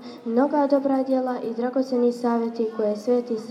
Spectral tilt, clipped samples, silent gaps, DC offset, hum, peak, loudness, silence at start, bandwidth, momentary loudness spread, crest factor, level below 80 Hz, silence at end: -6.5 dB/octave; under 0.1%; none; under 0.1%; none; -8 dBFS; -23 LUFS; 0 s; 10.5 kHz; 5 LU; 14 dB; -88 dBFS; 0 s